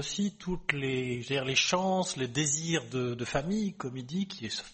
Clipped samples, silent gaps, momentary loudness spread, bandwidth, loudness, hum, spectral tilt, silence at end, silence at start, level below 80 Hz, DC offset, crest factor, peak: under 0.1%; none; 9 LU; 8.8 kHz; -31 LUFS; none; -3.5 dB/octave; 0 s; 0 s; -54 dBFS; under 0.1%; 22 dB; -8 dBFS